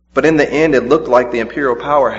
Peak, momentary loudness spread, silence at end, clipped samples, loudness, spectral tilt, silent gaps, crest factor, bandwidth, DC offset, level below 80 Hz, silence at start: 0 dBFS; 5 LU; 0 s; under 0.1%; -13 LUFS; -6 dB/octave; none; 14 dB; 8 kHz; under 0.1%; -42 dBFS; 0.15 s